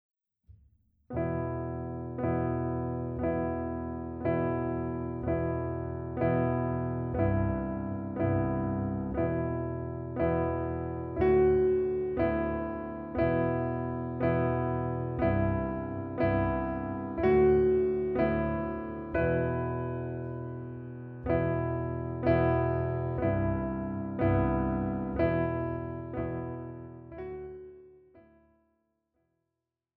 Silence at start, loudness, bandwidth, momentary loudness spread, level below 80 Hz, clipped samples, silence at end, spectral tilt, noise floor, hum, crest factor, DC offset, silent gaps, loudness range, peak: 0.5 s; -31 LUFS; 4.7 kHz; 11 LU; -46 dBFS; under 0.1%; 1.75 s; -9 dB/octave; -87 dBFS; none; 18 dB; under 0.1%; none; 6 LU; -14 dBFS